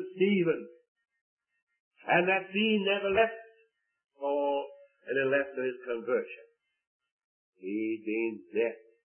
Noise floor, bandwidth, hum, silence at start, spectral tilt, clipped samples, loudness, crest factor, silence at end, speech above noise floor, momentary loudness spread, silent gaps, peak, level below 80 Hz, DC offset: -70 dBFS; 3.4 kHz; none; 0 s; -9 dB/octave; under 0.1%; -30 LUFS; 22 dB; 0.4 s; 40 dB; 19 LU; 0.88-0.96 s, 1.21-1.37 s, 1.62-1.67 s, 1.80-1.91 s, 6.87-7.00 s, 7.11-7.53 s; -10 dBFS; -72 dBFS; under 0.1%